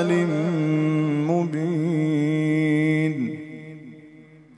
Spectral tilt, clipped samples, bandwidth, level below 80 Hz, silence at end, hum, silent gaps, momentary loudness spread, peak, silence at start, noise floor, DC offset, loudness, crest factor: -8 dB/octave; under 0.1%; 10.5 kHz; -70 dBFS; 0.35 s; none; none; 16 LU; -10 dBFS; 0 s; -48 dBFS; under 0.1%; -22 LUFS; 12 dB